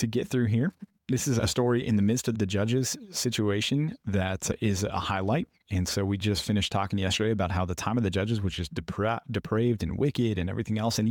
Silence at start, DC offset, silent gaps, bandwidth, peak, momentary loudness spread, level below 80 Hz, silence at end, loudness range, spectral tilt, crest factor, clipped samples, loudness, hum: 0 s; under 0.1%; none; 17.5 kHz; -14 dBFS; 5 LU; -50 dBFS; 0 s; 2 LU; -5 dB/octave; 14 dB; under 0.1%; -28 LUFS; none